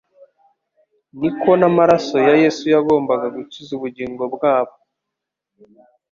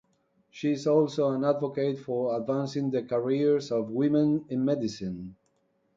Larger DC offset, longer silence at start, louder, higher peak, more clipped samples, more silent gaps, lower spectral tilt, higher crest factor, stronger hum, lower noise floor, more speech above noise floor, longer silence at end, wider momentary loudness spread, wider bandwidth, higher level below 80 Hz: neither; first, 1.15 s vs 0.55 s; first, -17 LUFS vs -28 LUFS; first, -2 dBFS vs -12 dBFS; neither; neither; about the same, -6.5 dB/octave vs -7.5 dB/octave; about the same, 16 dB vs 16 dB; neither; first, -82 dBFS vs -71 dBFS; first, 65 dB vs 44 dB; first, 1.45 s vs 0.65 s; first, 14 LU vs 8 LU; about the same, 7.4 kHz vs 7.6 kHz; first, -60 dBFS vs -68 dBFS